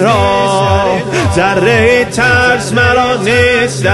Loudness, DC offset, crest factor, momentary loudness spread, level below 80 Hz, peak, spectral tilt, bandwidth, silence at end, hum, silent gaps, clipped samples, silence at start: -10 LUFS; 0.3%; 10 dB; 3 LU; -30 dBFS; 0 dBFS; -5 dB/octave; 12.5 kHz; 0 s; none; none; under 0.1%; 0 s